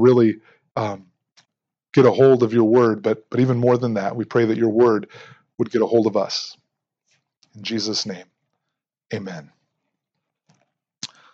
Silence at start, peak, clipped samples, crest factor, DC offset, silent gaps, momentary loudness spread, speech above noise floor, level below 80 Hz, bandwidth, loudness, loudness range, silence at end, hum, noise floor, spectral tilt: 0 s; -2 dBFS; under 0.1%; 20 dB; under 0.1%; none; 20 LU; 64 dB; -70 dBFS; 7.6 kHz; -19 LUFS; 12 LU; 0.25 s; none; -82 dBFS; -6.5 dB/octave